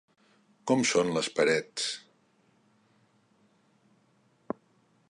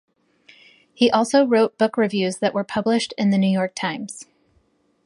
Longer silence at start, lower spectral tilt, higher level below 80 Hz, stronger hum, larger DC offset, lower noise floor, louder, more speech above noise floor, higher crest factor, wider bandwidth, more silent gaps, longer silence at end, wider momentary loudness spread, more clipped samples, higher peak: second, 0.65 s vs 1 s; second, -3.5 dB/octave vs -5.5 dB/octave; second, -74 dBFS vs -66 dBFS; neither; neither; first, -67 dBFS vs -63 dBFS; second, -29 LUFS vs -20 LUFS; second, 40 dB vs 44 dB; about the same, 22 dB vs 18 dB; about the same, 11.5 kHz vs 11.5 kHz; neither; first, 3.1 s vs 0.8 s; first, 16 LU vs 10 LU; neither; second, -12 dBFS vs -4 dBFS